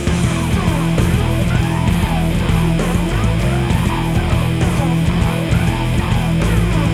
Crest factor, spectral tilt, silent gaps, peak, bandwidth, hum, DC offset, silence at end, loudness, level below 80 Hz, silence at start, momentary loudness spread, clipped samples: 12 dB; -6.5 dB/octave; none; -2 dBFS; 14.5 kHz; none; under 0.1%; 0 s; -16 LUFS; -22 dBFS; 0 s; 1 LU; under 0.1%